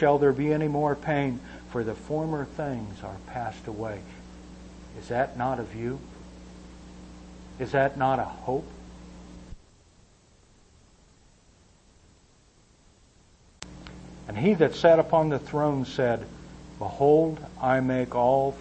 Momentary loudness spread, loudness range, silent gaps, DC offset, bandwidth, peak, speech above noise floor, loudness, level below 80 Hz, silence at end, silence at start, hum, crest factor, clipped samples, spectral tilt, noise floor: 25 LU; 10 LU; none; under 0.1%; 8.6 kHz; -8 dBFS; 34 dB; -26 LUFS; -50 dBFS; 0 s; 0 s; none; 20 dB; under 0.1%; -7.5 dB/octave; -59 dBFS